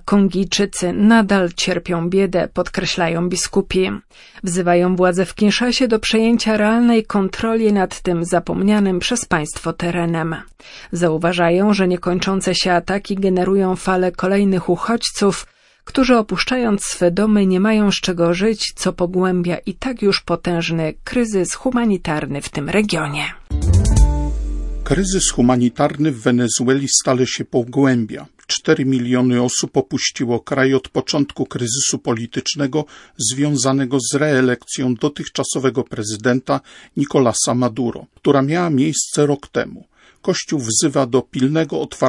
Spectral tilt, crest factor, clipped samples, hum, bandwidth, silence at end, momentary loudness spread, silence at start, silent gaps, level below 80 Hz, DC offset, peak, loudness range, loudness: -4.5 dB/octave; 16 dB; under 0.1%; none; 11.5 kHz; 0 s; 8 LU; 0.05 s; none; -32 dBFS; under 0.1%; 0 dBFS; 3 LU; -17 LUFS